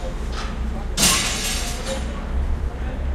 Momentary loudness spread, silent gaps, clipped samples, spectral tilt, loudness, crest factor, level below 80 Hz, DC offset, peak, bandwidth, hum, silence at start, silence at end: 12 LU; none; under 0.1%; -2.5 dB/octave; -23 LUFS; 20 dB; -26 dBFS; under 0.1%; -2 dBFS; 16 kHz; none; 0 s; 0 s